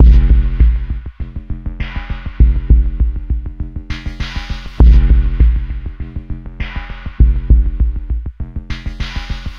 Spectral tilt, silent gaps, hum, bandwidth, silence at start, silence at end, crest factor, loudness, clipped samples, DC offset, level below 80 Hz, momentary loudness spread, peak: -8 dB/octave; none; none; 5.4 kHz; 0 s; 0 s; 12 dB; -17 LUFS; under 0.1%; under 0.1%; -14 dBFS; 15 LU; 0 dBFS